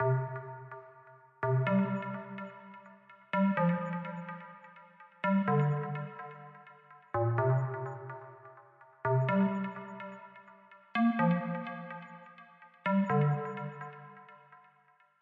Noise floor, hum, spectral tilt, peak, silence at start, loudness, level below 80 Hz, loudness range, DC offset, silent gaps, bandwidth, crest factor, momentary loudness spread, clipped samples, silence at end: -67 dBFS; none; -10 dB/octave; -18 dBFS; 0 s; -32 LUFS; -76 dBFS; 3 LU; under 0.1%; none; 4.7 kHz; 16 dB; 23 LU; under 0.1%; 0.65 s